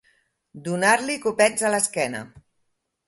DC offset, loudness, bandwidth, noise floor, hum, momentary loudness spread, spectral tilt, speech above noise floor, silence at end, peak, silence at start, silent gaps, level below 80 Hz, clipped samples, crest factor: under 0.1%; -21 LUFS; 12 kHz; -73 dBFS; none; 12 LU; -3 dB/octave; 51 dB; 0.7 s; -4 dBFS; 0.55 s; none; -66 dBFS; under 0.1%; 20 dB